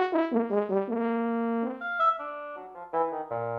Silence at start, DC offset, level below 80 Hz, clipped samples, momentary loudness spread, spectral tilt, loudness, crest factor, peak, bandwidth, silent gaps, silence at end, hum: 0 s; under 0.1%; -74 dBFS; under 0.1%; 11 LU; -8.5 dB/octave; -29 LUFS; 16 dB; -14 dBFS; 5.4 kHz; none; 0 s; none